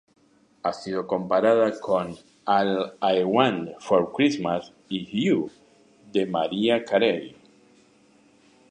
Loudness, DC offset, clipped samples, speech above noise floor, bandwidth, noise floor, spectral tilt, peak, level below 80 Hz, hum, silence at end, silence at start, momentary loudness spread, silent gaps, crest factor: -24 LUFS; under 0.1%; under 0.1%; 35 dB; 10 kHz; -58 dBFS; -6 dB/octave; -4 dBFS; -66 dBFS; none; 1.4 s; 0.65 s; 11 LU; none; 20 dB